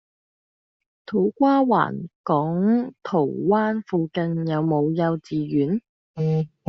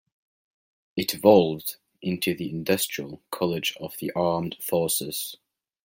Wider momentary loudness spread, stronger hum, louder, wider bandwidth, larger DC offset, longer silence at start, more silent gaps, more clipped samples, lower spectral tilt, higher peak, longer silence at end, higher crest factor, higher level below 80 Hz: second, 8 LU vs 16 LU; neither; first, -22 LUFS vs -25 LUFS; second, 6.2 kHz vs 16.5 kHz; neither; first, 1.1 s vs 0.95 s; first, 2.15-2.24 s, 5.89-6.14 s vs none; neither; first, -7.5 dB/octave vs -4.5 dB/octave; about the same, -4 dBFS vs -4 dBFS; second, 0.2 s vs 0.5 s; about the same, 18 dB vs 22 dB; about the same, -64 dBFS vs -64 dBFS